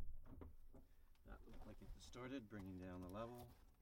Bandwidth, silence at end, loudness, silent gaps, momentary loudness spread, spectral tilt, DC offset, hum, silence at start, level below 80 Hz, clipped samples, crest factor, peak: 16.5 kHz; 0 s; -57 LUFS; none; 11 LU; -6.5 dB/octave; under 0.1%; none; 0 s; -62 dBFS; under 0.1%; 16 dB; -40 dBFS